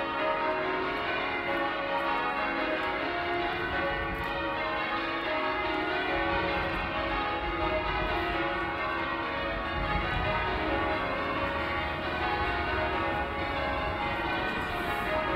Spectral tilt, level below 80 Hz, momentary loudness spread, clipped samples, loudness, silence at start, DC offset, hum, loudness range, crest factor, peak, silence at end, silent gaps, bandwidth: -6 dB/octave; -44 dBFS; 2 LU; under 0.1%; -30 LUFS; 0 s; under 0.1%; none; 1 LU; 16 dB; -16 dBFS; 0 s; none; 16 kHz